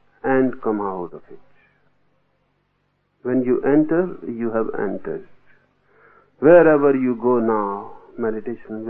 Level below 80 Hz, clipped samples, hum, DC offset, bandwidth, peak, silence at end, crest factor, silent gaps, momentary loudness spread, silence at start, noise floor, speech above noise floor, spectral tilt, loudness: -58 dBFS; under 0.1%; none; under 0.1%; 3.4 kHz; 0 dBFS; 0 s; 20 dB; none; 18 LU; 0.25 s; -67 dBFS; 49 dB; -12 dB/octave; -19 LUFS